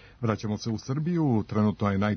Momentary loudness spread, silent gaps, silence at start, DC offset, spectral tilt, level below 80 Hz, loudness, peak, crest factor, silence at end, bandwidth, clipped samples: 6 LU; none; 0.05 s; under 0.1%; -7.5 dB/octave; -58 dBFS; -28 LUFS; -10 dBFS; 18 dB; 0 s; 6.6 kHz; under 0.1%